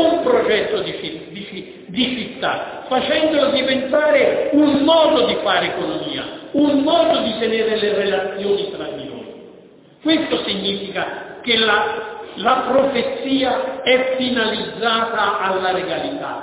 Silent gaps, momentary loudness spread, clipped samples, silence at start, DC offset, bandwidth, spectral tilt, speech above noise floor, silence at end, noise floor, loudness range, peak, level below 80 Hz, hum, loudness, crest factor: none; 12 LU; under 0.1%; 0 s; under 0.1%; 4 kHz; -8.5 dB/octave; 27 dB; 0 s; -45 dBFS; 5 LU; -2 dBFS; -54 dBFS; none; -18 LUFS; 16 dB